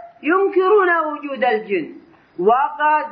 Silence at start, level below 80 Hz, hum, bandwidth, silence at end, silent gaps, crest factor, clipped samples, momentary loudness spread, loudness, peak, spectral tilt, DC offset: 0 s; -70 dBFS; none; 5 kHz; 0 s; none; 14 dB; under 0.1%; 10 LU; -18 LUFS; -4 dBFS; -8 dB/octave; under 0.1%